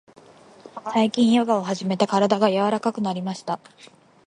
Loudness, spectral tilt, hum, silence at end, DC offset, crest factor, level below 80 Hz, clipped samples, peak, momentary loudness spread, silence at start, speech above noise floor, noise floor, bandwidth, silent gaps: -22 LUFS; -6 dB/octave; none; 0.7 s; under 0.1%; 20 dB; -68 dBFS; under 0.1%; -2 dBFS; 13 LU; 0.65 s; 26 dB; -47 dBFS; 11 kHz; none